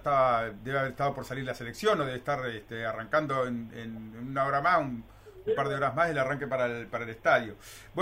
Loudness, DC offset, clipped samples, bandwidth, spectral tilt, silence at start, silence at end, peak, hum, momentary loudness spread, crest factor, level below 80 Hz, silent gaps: -30 LUFS; under 0.1%; under 0.1%; 16 kHz; -5.5 dB/octave; 0 s; 0 s; -12 dBFS; none; 14 LU; 18 dB; -58 dBFS; none